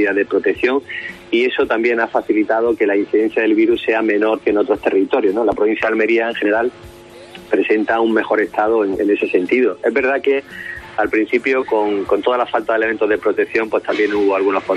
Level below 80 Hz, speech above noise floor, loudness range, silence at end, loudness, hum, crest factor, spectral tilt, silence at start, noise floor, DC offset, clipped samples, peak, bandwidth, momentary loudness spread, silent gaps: -52 dBFS; 21 dB; 2 LU; 0 s; -16 LUFS; none; 14 dB; -6 dB/octave; 0 s; -37 dBFS; under 0.1%; under 0.1%; -2 dBFS; 9.4 kHz; 4 LU; none